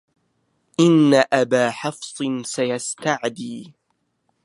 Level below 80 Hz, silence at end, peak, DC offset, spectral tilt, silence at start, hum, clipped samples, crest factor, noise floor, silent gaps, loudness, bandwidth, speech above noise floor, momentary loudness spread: -72 dBFS; 0.75 s; -2 dBFS; under 0.1%; -5 dB/octave; 0.8 s; none; under 0.1%; 20 dB; -71 dBFS; none; -20 LUFS; 11.5 kHz; 52 dB; 15 LU